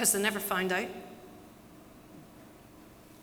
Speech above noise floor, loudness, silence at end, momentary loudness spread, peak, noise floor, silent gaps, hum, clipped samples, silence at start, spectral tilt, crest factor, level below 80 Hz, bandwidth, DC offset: 23 dB; -30 LUFS; 0 s; 25 LU; -12 dBFS; -54 dBFS; none; none; under 0.1%; 0 s; -2 dB/octave; 24 dB; -66 dBFS; over 20 kHz; under 0.1%